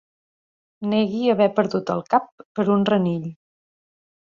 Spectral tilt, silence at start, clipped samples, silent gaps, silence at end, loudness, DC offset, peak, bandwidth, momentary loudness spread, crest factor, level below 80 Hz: -8 dB/octave; 0.8 s; under 0.1%; 2.32-2.38 s, 2.45-2.55 s; 1 s; -21 LUFS; under 0.1%; -4 dBFS; 7.2 kHz; 11 LU; 20 dB; -64 dBFS